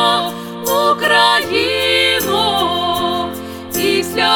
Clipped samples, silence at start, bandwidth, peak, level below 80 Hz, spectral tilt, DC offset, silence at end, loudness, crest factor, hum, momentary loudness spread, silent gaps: under 0.1%; 0 s; over 20 kHz; 0 dBFS; -48 dBFS; -2.5 dB/octave; under 0.1%; 0 s; -14 LUFS; 14 dB; none; 12 LU; none